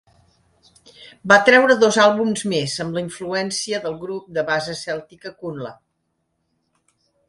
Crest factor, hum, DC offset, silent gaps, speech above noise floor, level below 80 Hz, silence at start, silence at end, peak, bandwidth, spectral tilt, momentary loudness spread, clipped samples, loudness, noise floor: 20 dB; none; under 0.1%; none; 53 dB; -62 dBFS; 1 s; 1.55 s; 0 dBFS; 11.5 kHz; -3.5 dB/octave; 19 LU; under 0.1%; -18 LUFS; -72 dBFS